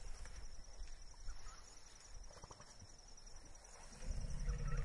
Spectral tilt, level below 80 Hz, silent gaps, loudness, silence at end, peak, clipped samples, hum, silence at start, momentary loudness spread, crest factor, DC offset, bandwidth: -4 dB/octave; -48 dBFS; none; -54 LUFS; 0 s; -28 dBFS; under 0.1%; none; 0 s; 12 LU; 18 dB; under 0.1%; 11.5 kHz